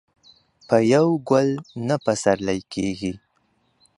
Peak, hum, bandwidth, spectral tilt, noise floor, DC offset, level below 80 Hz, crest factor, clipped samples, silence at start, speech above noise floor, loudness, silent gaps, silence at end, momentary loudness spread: -4 dBFS; none; 11.5 kHz; -6 dB/octave; -66 dBFS; under 0.1%; -56 dBFS; 20 dB; under 0.1%; 0.7 s; 46 dB; -21 LUFS; none; 0.8 s; 11 LU